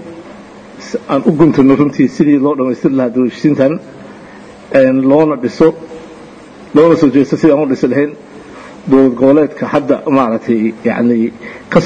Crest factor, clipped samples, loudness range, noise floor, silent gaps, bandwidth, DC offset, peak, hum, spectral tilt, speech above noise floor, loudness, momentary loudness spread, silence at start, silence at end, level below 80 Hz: 12 dB; 0.2%; 2 LU; -34 dBFS; none; 8.6 kHz; under 0.1%; 0 dBFS; none; -8 dB/octave; 24 dB; -11 LUFS; 19 LU; 0 s; 0 s; -48 dBFS